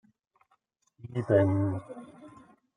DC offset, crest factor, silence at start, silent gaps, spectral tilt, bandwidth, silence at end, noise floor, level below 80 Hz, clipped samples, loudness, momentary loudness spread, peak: under 0.1%; 20 dB; 1.05 s; none; -9.5 dB/octave; 9.8 kHz; 0.5 s; -73 dBFS; -68 dBFS; under 0.1%; -28 LUFS; 24 LU; -10 dBFS